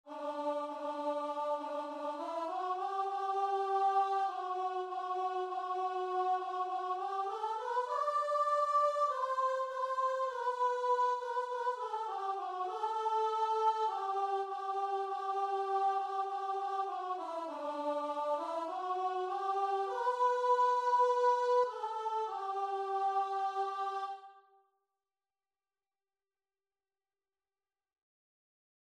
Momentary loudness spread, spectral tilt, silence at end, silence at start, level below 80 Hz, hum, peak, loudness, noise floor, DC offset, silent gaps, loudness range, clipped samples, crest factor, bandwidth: 8 LU; -2 dB/octave; 4.5 s; 0.05 s; -88 dBFS; none; -20 dBFS; -35 LUFS; under -90 dBFS; under 0.1%; none; 5 LU; under 0.1%; 16 dB; 11.5 kHz